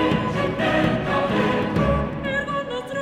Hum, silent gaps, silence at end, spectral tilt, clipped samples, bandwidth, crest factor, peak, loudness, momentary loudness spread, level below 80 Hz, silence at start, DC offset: none; none; 0 s; -7 dB/octave; under 0.1%; 13.5 kHz; 14 dB; -6 dBFS; -22 LUFS; 5 LU; -38 dBFS; 0 s; under 0.1%